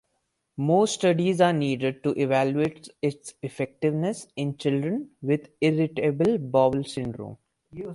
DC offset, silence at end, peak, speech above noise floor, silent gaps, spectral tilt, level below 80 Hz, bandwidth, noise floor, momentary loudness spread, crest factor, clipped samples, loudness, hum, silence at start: under 0.1%; 0 s; -6 dBFS; 51 dB; none; -6.5 dB/octave; -62 dBFS; 11.5 kHz; -76 dBFS; 12 LU; 18 dB; under 0.1%; -25 LUFS; none; 0.6 s